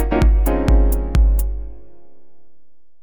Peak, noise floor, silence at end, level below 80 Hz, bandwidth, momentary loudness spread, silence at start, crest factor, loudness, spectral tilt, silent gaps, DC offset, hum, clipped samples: 0 dBFS; -55 dBFS; 0 s; -18 dBFS; over 20 kHz; 13 LU; 0 s; 16 dB; -18 LUFS; -7.5 dB/octave; none; 3%; none; under 0.1%